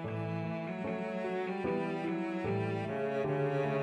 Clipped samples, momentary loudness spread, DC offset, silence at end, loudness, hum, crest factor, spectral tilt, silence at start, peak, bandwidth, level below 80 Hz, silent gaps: under 0.1%; 5 LU; under 0.1%; 0 s; -35 LUFS; none; 12 dB; -8.5 dB/octave; 0 s; -22 dBFS; 10.5 kHz; -68 dBFS; none